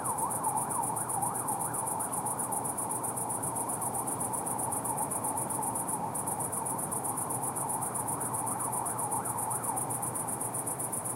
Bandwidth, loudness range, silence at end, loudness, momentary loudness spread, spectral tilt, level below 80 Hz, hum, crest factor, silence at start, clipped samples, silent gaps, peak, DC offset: 16 kHz; 0 LU; 0 s; -32 LUFS; 1 LU; -4 dB/octave; -66 dBFS; none; 14 dB; 0 s; under 0.1%; none; -18 dBFS; under 0.1%